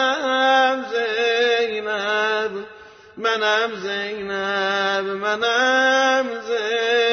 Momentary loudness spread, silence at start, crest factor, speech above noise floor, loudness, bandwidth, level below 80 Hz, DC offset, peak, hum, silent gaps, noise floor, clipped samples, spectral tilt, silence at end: 9 LU; 0 s; 14 dB; 23 dB; -20 LUFS; 6.6 kHz; -66 dBFS; under 0.1%; -6 dBFS; none; none; -43 dBFS; under 0.1%; -2 dB/octave; 0 s